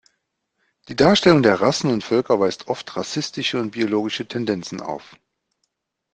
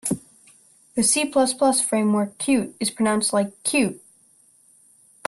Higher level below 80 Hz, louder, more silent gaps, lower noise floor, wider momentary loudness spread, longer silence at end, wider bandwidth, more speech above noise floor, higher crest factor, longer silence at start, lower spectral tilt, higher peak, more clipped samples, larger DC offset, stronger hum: first, -56 dBFS vs -64 dBFS; about the same, -20 LUFS vs -21 LUFS; neither; first, -75 dBFS vs -57 dBFS; first, 14 LU vs 8 LU; second, 1.1 s vs 1.3 s; second, 9.8 kHz vs 12.5 kHz; first, 55 dB vs 36 dB; about the same, 20 dB vs 18 dB; first, 0.9 s vs 0.05 s; first, -5 dB/octave vs -3.5 dB/octave; first, -2 dBFS vs -6 dBFS; neither; neither; neither